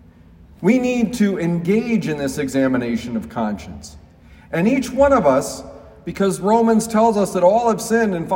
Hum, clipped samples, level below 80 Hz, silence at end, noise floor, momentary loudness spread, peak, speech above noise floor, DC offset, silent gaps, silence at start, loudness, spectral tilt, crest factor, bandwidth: none; under 0.1%; -46 dBFS; 0 s; -45 dBFS; 13 LU; -2 dBFS; 28 dB; under 0.1%; none; 0.6 s; -18 LUFS; -6 dB/octave; 16 dB; 16.5 kHz